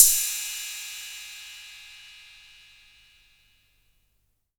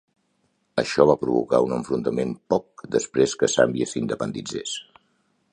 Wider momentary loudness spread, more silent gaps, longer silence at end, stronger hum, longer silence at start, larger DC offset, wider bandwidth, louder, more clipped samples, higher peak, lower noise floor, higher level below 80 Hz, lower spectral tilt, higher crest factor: first, 23 LU vs 11 LU; neither; first, 2.45 s vs 0.7 s; first, 50 Hz at -75 dBFS vs none; second, 0 s vs 0.75 s; neither; first, over 20 kHz vs 11 kHz; second, -26 LUFS vs -23 LUFS; neither; about the same, 0 dBFS vs -2 dBFS; about the same, -71 dBFS vs -69 dBFS; about the same, -58 dBFS vs -58 dBFS; second, 5.5 dB/octave vs -4.5 dB/octave; first, 30 dB vs 22 dB